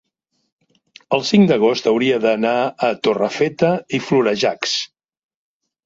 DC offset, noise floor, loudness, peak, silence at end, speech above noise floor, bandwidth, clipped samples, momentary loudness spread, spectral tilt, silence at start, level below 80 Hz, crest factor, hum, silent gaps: under 0.1%; -71 dBFS; -17 LUFS; -2 dBFS; 1 s; 54 dB; 7.8 kHz; under 0.1%; 7 LU; -5 dB/octave; 1.1 s; -60 dBFS; 16 dB; none; none